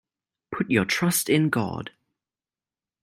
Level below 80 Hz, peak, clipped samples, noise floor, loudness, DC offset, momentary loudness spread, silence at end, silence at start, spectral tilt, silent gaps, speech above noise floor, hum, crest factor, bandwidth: -62 dBFS; -8 dBFS; under 0.1%; under -90 dBFS; -23 LUFS; under 0.1%; 15 LU; 1.15 s; 0.5 s; -4.5 dB/octave; none; over 67 dB; none; 20 dB; 16 kHz